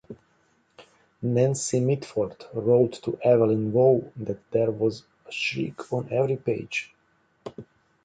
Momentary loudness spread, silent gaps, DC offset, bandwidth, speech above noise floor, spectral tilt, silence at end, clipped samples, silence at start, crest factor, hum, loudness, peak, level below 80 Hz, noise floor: 15 LU; none; under 0.1%; 9.4 kHz; 42 dB; -6 dB/octave; 0.4 s; under 0.1%; 0.1 s; 18 dB; none; -25 LUFS; -8 dBFS; -64 dBFS; -66 dBFS